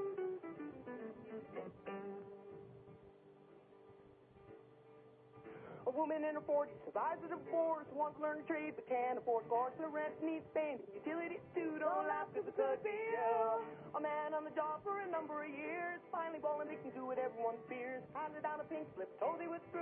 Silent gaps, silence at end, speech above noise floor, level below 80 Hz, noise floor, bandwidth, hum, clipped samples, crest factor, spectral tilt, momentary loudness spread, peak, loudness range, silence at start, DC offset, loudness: none; 0 s; 22 dB; -84 dBFS; -63 dBFS; 3.7 kHz; none; under 0.1%; 18 dB; -4.5 dB/octave; 14 LU; -24 dBFS; 14 LU; 0 s; under 0.1%; -42 LUFS